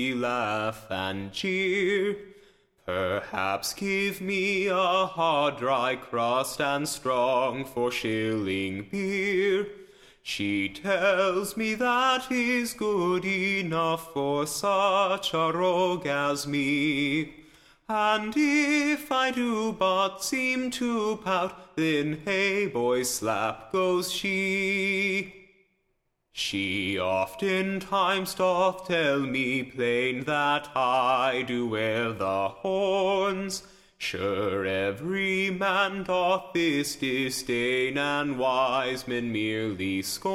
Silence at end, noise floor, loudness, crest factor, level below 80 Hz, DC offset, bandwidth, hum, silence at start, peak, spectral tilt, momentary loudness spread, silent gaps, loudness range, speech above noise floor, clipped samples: 0 s; -75 dBFS; -26 LUFS; 16 dB; -62 dBFS; under 0.1%; 16 kHz; none; 0 s; -10 dBFS; -4 dB/octave; 6 LU; none; 3 LU; 48 dB; under 0.1%